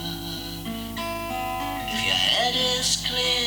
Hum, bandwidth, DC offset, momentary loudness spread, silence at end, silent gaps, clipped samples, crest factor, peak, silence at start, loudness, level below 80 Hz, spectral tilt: none; over 20 kHz; under 0.1%; 12 LU; 0 s; none; under 0.1%; 18 dB; -8 dBFS; 0 s; -24 LUFS; -44 dBFS; -2 dB/octave